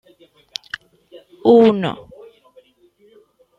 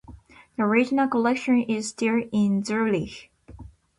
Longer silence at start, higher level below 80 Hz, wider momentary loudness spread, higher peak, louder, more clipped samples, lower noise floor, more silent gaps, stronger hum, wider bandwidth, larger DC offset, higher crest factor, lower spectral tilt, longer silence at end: first, 1.15 s vs 0.1 s; second, -62 dBFS vs -54 dBFS; first, 22 LU vs 8 LU; first, -2 dBFS vs -8 dBFS; first, -16 LUFS vs -23 LUFS; neither; first, -55 dBFS vs -48 dBFS; neither; neither; second, 7.4 kHz vs 11 kHz; neither; about the same, 18 dB vs 16 dB; about the same, -6.5 dB/octave vs -5.5 dB/octave; first, 1.6 s vs 0.3 s